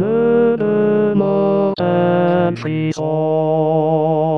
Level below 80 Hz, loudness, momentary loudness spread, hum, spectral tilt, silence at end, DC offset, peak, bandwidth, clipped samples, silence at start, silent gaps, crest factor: -62 dBFS; -16 LUFS; 4 LU; none; -8.5 dB/octave; 0 s; 0.4%; -4 dBFS; 7.4 kHz; under 0.1%; 0 s; none; 12 dB